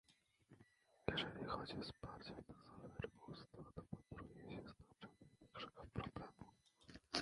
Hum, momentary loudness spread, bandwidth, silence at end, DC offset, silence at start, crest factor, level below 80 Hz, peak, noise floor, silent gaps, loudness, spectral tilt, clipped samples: none; 18 LU; 11 kHz; 0 s; under 0.1%; 0.1 s; 32 dB; -68 dBFS; -22 dBFS; -73 dBFS; none; -52 LUFS; -5 dB/octave; under 0.1%